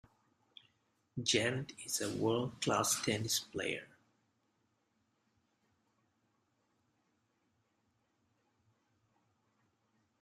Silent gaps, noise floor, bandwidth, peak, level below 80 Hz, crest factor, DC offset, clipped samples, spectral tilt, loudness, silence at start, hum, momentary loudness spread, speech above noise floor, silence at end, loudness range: none; -80 dBFS; 13.5 kHz; -18 dBFS; -76 dBFS; 24 dB; under 0.1%; under 0.1%; -3 dB/octave; -35 LUFS; 1.15 s; none; 8 LU; 44 dB; 6.35 s; 10 LU